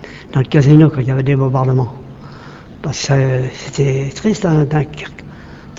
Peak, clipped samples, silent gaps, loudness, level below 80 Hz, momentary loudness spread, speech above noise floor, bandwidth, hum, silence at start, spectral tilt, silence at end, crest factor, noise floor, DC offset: 0 dBFS; under 0.1%; none; -14 LUFS; -40 dBFS; 25 LU; 21 dB; 7.8 kHz; none; 0 s; -7 dB/octave; 0 s; 14 dB; -34 dBFS; under 0.1%